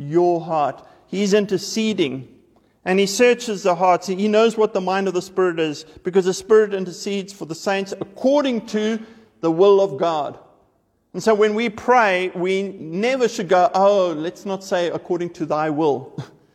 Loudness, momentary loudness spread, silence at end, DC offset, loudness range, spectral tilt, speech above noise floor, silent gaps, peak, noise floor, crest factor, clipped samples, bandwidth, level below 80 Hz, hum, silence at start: -20 LUFS; 11 LU; 0.3 s; under 0.1%; 2 LU; -5 dB/octave; 44 dB; none; -4 dBFS; -63 dBFS; 16 dB; under 0.1%; 14.5 kHz; -64 dBFS; none; 0 s